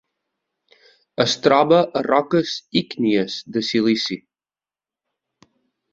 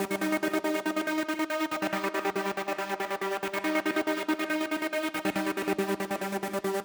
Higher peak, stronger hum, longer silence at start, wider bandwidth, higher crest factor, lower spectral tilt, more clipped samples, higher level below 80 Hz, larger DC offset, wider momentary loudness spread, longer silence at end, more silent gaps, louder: first, -2 dBFS vs -14 dBFS; neither; first, 1.2 s vs 0 s; second, 7.8 kHz vs over 20 kHz; about the same, 20 dB vs 16 dB; about the same, -5 dB/octave vs -4 dB/octave; neither; first, -62 dBFS vs -70 dBFS; neither; first, 9 LU vs 3 LU; first, 1.75 s vs 0 s; neither; first, -19 LUFS vs -30 LUFS